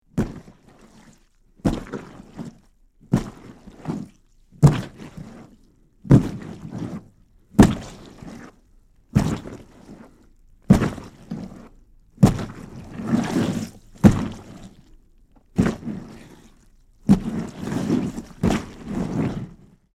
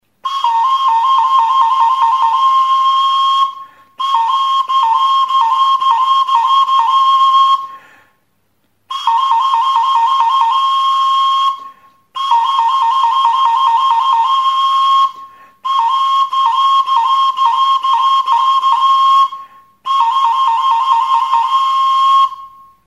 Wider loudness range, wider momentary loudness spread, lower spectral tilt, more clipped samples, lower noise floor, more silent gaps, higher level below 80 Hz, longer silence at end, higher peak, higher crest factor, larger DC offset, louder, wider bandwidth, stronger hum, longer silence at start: first, 8 LU vs 2 LU; first, 23 LU vs 6 LU; first, -7.5 dB/octave vs 2 dB/octave; neither; second, -56 dBFS vs -62 dBFS; neither; first, -38 dBFS vs -72 dBFS; about the same, 0.45 s vs 0.4 s; about the same, -2 dBFS vs 0 dBFS; first, 22 dB vs 12 dB; second, under 0.1% vs 0.1%; second, -22 LUFS vs -12 LUFS; first, 15 kHz vs 11.5 kHz; neither; about the same, 0.15 s vs 0.25 s